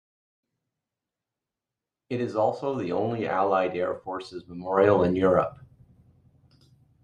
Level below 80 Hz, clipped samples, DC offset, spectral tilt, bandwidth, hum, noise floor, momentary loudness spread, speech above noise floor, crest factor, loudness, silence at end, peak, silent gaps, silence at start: -64 dBFS; under 0.1%; under 0.1%; -8 dB/octave; 9.4 kHz; none; -89 dBFS; 14 LU; 64 dB; 22 dB; -25 LUFS; 1.5 s; -6 dBFS; none; 2.1 s